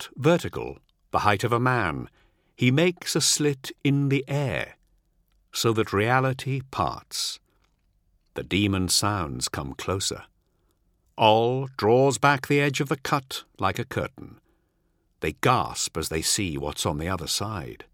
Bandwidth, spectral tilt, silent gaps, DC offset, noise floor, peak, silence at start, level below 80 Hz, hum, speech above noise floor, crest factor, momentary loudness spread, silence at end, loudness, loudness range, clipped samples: 17 kHz; -4 dB/octave; none; under 0.1%; -69 dBFS; -2 dBFS; 0 s; -50 dBFS; none; 45 dB; 24 dB; 12 LU; 0.15 s; -24 LUFS; 4 LU; under 0.1%